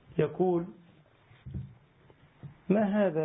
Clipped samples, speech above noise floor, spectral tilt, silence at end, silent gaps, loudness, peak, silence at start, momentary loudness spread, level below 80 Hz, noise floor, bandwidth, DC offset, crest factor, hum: under 0.1%; 33 dB; -11.5 dB/octave; 0 s; none; -29 LUFS; -12 dBFS; 0.1 s; 24 LU; -58 dBFS; -60 dBFS; 3.8 kHz; under 0.1%; 18 dB; none